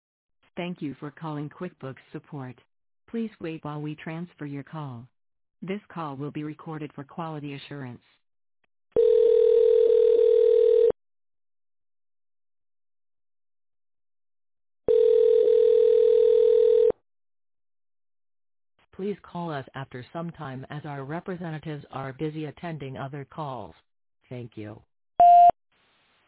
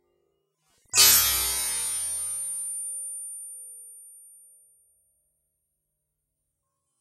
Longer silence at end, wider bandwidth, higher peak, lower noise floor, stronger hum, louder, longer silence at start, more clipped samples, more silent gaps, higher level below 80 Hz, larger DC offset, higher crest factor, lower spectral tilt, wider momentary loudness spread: second, 0.8 s vs 2.8 s; second, 4 kHz vs 16 kHz; second, -10 dBFS vs -4 dBFS; second, -65 dBFS vs -80 dBFS; neither; about the same, -22 LUFS vs -22 LUFS; second, 0.55 s vs 0.95 s; neither; neither; second, -64 dBFS vs -54 dBFS; neither; second, 16 dB vs 26 dB; first, -10.5 dB/octave vs 1.5 dB/octave; second, 20 LU vs 24 LU